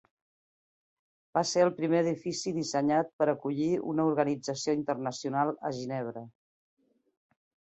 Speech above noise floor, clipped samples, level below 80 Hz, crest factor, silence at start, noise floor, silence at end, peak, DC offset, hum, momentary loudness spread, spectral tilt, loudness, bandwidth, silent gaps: over 61 dB; under 0.1%; -74 dBFS; 20 dB; 1.35 s; under -90 dBFS; 1.45 s; -12 dBFS; under 0.1%; none; 8 LU; -5 dB/octave; -30 LUFS; 8.2 kHz; 3.13-3.19 s